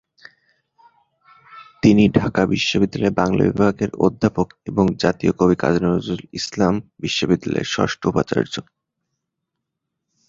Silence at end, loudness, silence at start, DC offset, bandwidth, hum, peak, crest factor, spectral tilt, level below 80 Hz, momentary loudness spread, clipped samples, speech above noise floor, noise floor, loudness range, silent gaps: 1.65 s; -19 LUFS; 1.55 s; under 0.1%; 7.6 kHz; none; 0 dBFS; 20 dB; -6 dB/octave; -46 dBFS; 7 LU; under 0.1%; 61 dB; -79 dBFS; 4 LU; none